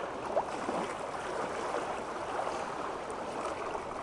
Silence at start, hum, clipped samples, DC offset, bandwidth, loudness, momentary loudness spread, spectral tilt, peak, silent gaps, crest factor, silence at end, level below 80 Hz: 0 s; none; under 0.1%; under 0.1%; 11.5 kHz; -36 LUFS; 3 LU; -4 dB/octave; -18 dBFS; none; 20 dB; 0 s; -62 dBFS